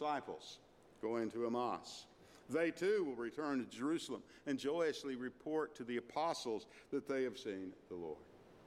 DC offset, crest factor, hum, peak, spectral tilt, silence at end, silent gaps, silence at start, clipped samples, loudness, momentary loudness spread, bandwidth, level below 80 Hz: under 0.1%; 16 dB; none; -26 dBFS; -4.5 dB/octave; 0 s; none; 0 s; under 0.1%; -42 LUFS; 12 LU; 15 kHz; -78 dBFS